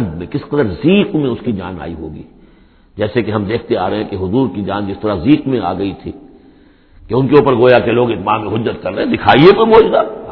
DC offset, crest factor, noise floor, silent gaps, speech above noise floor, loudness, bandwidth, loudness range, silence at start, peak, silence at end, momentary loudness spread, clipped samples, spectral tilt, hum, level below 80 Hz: under 0.1%; 14 dB; -46 dBFS; none; 33 dB; -13 LUFS; 5.4 kHz; 8 LU; 0 s; 0 dBFS; 0 s; 14 LU; 0.3%; -9.5 dB/octave; none; -40 dBFS